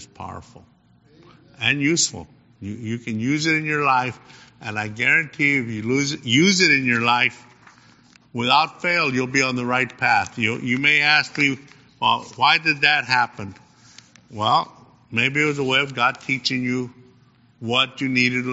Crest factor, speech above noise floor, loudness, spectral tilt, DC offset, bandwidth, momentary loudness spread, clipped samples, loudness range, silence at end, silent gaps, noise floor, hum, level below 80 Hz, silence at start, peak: 20 dB; 34 dB; -19 LUFS; -2 dB/octave; under 0.1%; 8 kHz; 17 LU; under 0.1%; 4 LU; 0 s; none; -55 dBFS; none; -62 dBFS; 0 s; -2 dBFS